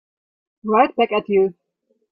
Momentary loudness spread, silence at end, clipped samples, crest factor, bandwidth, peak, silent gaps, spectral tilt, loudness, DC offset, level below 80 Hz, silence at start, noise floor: 6 LU; 0.6 s; under 0.1%; 18 dB; 5 kHz; -2 dBFS; none; -10 dB/octave; -18 LUFS; under 0.1%; -64 dBFS; 0.65 s; -69 dBFS